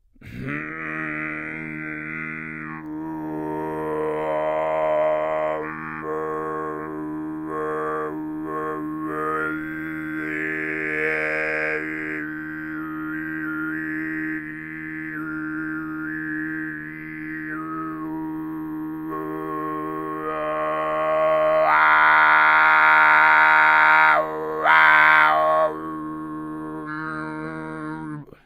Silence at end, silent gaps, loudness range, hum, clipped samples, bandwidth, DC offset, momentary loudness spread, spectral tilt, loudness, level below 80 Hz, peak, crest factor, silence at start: 0.15 s; none; 15 LU; none; under 0.1%; 16 kHz; under 0.1%; 17 LU; -6 dB/octave; -21 LUFS; -58 dBFS; 0 dBFS; 22 dB; 0.2 s